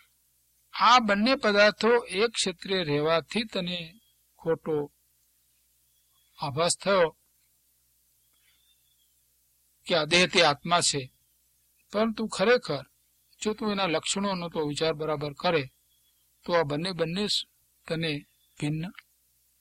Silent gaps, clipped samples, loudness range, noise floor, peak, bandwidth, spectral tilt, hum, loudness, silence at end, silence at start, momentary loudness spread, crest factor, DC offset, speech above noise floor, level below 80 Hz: none; under 0.1%; 7 LU; -68 dBFS; -6 dBFS; 15.5 kHz; -3.5 dB/octave; 60 Hz at -60 dBFS; -26 LUFS; 0.7 s; 0.75 s; 15 LU; 24 dB; under 0.1%; 42 dB; -62 dBFS